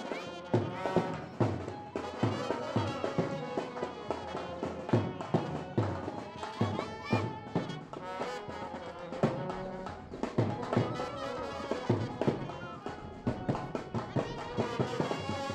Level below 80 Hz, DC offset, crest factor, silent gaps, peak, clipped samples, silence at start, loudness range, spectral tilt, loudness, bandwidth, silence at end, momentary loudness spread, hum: -60 dBFS; under 0.1%; 22 dB; none; -14 dBFS; under 0.1%; 0 s; 2 LU; -7 dB/octave; -35 LUFS; 11 kHz; 0 s; 9 LU; none